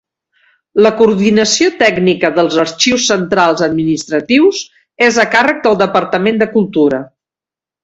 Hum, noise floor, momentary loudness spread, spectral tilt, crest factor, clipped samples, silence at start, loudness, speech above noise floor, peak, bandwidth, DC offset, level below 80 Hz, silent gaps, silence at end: none; -88 dBFS; 5 LU; -4 dB/octave; 12 dB; under 0.1%; 0.75 s; -11 LUFS; 77 dB; 0 dBFS; 8.2 kHz; under 0.1%; -50 dBFS; none; 0.8 s